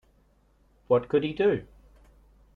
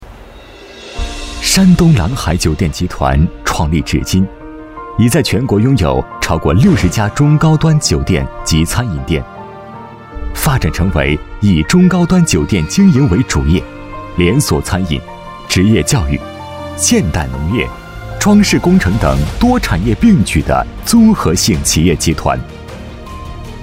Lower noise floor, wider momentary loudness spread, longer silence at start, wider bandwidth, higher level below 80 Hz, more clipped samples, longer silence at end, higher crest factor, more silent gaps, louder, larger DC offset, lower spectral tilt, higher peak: first, -63 dBFS vs -34 dBFS; second, 4 LU vs 19 LU; first, 0.9 s vs 0 s; second, 4.7 kHz vs 16 kHz; second, -58 dBFS vs -24 dBFS; neither; first, 0.95 s vs 0 s; first, 20 dB vs 12 dB; neither; second, -26 LUFS vs -12 LUFS; neither; first, -8.5 dB/octave vs -5.5 dB/octave; second, -10 dBFS vs 0 dBFS